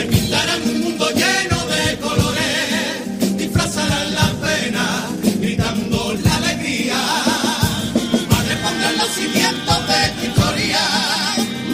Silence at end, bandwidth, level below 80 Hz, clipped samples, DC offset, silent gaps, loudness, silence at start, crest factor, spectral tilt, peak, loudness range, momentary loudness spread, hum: 0 s; 15.5 kHz; -38 dBFS; under 0.1%; under 0.1%; none; -17 LUFS; 0 s; 18 dB; -3.5 dB/octave; 0 dBFS; 2 LU; 4 LU; none